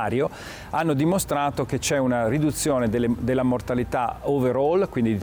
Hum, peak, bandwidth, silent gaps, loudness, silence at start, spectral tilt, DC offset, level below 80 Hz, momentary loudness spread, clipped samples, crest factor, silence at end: none; -12 dBFS; over 20 kHz; none; -23 LUFS; 0 s; -5.5 dB/octave; under 0.1%; -44 dBFS; 4 LU; under 0.1%; 10 dB; 0 s